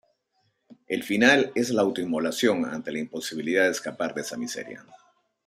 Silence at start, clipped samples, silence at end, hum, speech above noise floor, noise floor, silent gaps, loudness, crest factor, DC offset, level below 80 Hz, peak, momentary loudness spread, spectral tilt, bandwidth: 0.9 s; under 0.1%; 0.5 s; none; 47 dB; -72 dBFS; none; -25 LUFS; 22 dB; under 0.1%; -70 dBFS; -4 dBFS; 14 LU; -3.5 dB/octave; 15.5 kHz